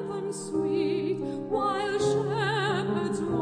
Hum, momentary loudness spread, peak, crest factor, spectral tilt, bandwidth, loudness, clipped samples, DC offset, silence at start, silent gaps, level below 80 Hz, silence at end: none; 5 LU; -14 dBFS; 14 dB; -5.5 dB/octave; 10.5 kHz; -28 LUFS; under 0.1%; under 0.1%; 0 s; none; -60 dBFS; 0 s